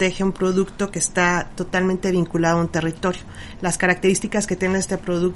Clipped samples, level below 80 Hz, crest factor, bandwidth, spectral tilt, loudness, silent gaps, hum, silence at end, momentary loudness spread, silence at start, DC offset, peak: under 0.1%; -42 dBFS; 18 dB; 11.5 kHz; -4.5 dB/octave; -21 LUFS; none; none; 0 s; 7 LU; 0 s; under 0.1%; -4 dBFS